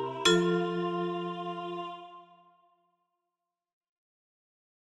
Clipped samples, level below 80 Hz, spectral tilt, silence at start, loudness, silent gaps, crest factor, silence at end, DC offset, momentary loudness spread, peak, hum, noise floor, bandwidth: under 0.1%; -70 dBFS; -4.5 dB/octave; 0 s; -30 LUFS; none; 24 dB; 2.6 s; under 0.1%; 17 LU; -10 dBFS; none; -88 dBFS; 12 kHz